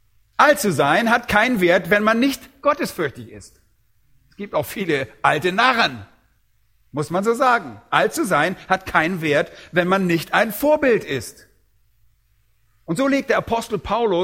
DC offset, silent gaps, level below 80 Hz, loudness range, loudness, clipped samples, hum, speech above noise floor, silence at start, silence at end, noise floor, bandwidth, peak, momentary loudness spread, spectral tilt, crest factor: under 0.1%; none; -52 dBFS; 5 LU; -19 LUFS; under 0.1%; none; 44 dB; 0.4 s; 0 s; -63 dBFS; 16.5 kHz; 0 dBFS; 11 LU; -4.5 dB/octave; 20 dB